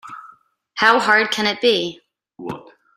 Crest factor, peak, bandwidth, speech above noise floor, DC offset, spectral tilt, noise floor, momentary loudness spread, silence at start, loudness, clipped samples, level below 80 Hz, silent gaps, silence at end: 20 dB; 0 dBFS; 15.5 kHz; 33 dB; under 0.1%; -3 dB/octave; -51 dBFS; 21 LU; 0.05 s; -16 LUFS; under 0.1%; -66 dBFS; none; 0.35 s